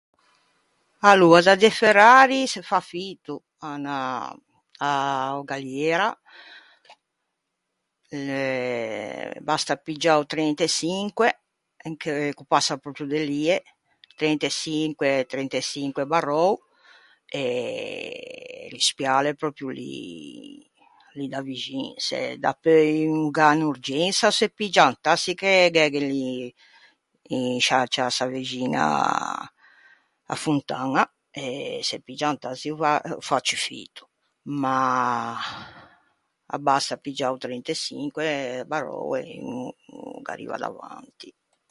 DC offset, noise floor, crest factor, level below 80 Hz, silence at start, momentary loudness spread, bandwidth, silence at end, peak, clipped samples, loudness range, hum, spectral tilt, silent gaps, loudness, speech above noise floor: under 0.1%; -79 dBFS; 24 dB; -70 dBFS; 1 s; 17 LU; 11.5 kHz; 0.4 s; 0 dBFS; under 0.1%; 9 LU; none; -3.5 dB/octave; none; -23 LUFS; 56 dB